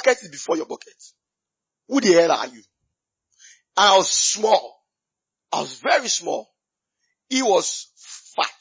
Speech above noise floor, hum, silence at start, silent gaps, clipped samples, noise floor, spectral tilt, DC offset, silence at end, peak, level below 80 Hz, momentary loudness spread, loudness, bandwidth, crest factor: 66 dB; none; 0 s; none; under 0.1%; -86 dBFS; -1.5 dB/octave; under 0.1%; 0.1 s; -4 dBFS; -74 dBFS; 16 LU; -20 LUFS; 8 kHz; 18 dB